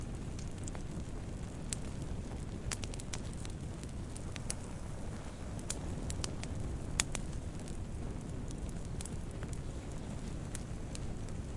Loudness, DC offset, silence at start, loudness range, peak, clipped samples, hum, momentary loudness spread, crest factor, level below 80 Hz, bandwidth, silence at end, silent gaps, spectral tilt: -42 LUFS; under 0.1%; 0 s; 3 LU; -8 dBFS; under 0.1%; none; 4 LU; 32 dB; -46 dBFS; 11.5 kHz; 0 s; none; -4.5 dB/octave